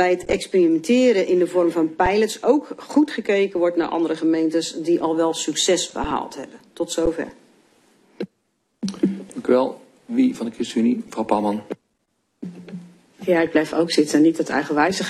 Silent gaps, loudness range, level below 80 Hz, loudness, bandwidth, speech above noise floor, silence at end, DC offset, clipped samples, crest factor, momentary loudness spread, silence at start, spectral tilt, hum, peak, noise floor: none; 7 LU; -48 dBFS; -20 LUFS; 13 kHz; 51 dB; 0 s; under 0.1%; under 0.1%; 18 dB; 17 LU; 0 s; -4.5 dB/octave; none; -4 dBFS; -71 dBFS